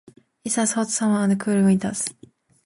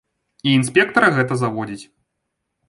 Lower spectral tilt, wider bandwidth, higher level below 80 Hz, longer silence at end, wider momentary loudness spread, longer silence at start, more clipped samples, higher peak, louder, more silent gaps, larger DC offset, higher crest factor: about the same, -5 dB/octave vs -5 dB/octave; about the same, 11.5 kHz vs 11.5 kHz; about the same, -60 dBFS vs -60 dBFS; second, 0.55 s vs 0.85 s; second, 9 LU vs 14 LU; about the same, 0.45 s vs 0.45 s; neither; second, -8 dBFS vs -2 dBFS; second, -21 LUFS vs -17 LUFS; neither; neither; about the same, 14 dB vs 18 dB